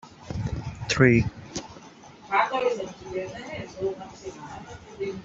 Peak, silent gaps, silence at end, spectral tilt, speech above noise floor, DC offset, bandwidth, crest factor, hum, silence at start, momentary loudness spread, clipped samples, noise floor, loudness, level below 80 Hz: -4 dBFS; none; 0 s; -5.5 dB/octave; 21 dB; under 0.1%; 7.8 kHz; 24 dB; none; 0.05 s; 21 LU; under 0.1%; -48 dBFS; -27 LUFS; -48 dBFS